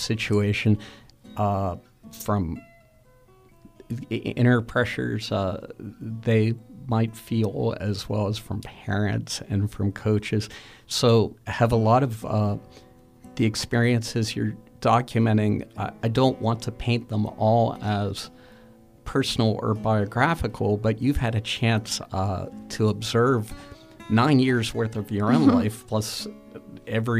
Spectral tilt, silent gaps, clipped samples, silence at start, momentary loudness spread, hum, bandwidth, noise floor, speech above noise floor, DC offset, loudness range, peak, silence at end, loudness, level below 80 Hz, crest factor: -6 dB/octave; none; under 0.1%; 0 s; 14 LU; none; 15 kHz; -56 dBFS; 32 dB; under 0.1%; 4 LU; -6 dBFS; 0 s; -24 LUFS; -46 dBFS; 20 dB